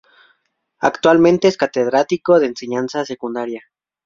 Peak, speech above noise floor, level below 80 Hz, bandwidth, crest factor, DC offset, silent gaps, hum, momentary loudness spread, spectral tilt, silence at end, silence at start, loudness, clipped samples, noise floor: 0 dBFS; 50 dB; -58 dBFS; 7.4 kHz; 16 dB; under 0.1%; none; none; 12 LU; -5.5 dB/octave; 0.45 s; 0.8 s; -16 LUFS; under 0.1%; -66 dBFS